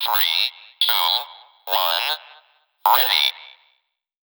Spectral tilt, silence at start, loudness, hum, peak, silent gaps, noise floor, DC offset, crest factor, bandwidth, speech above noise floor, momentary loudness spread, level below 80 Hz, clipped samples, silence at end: 5 dB/octave; 0 s; -19 LUFS; none; -2 dBFS; none; -69 dBFS; under 0.1%; 20 dB; over 20 kHz; 49 dB; 9 LU; under -90 dBFS; under 0.1%; 0.75 s